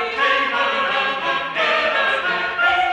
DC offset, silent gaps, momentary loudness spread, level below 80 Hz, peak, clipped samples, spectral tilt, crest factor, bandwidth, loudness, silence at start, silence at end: under 0.1%; none; 3 LU; -56 dBFS; -4 dBFS; under 0.1%; -2.5 dB/octave; 14 dB; 11.5 kHz; -18 LUFS; 0 s; 0 s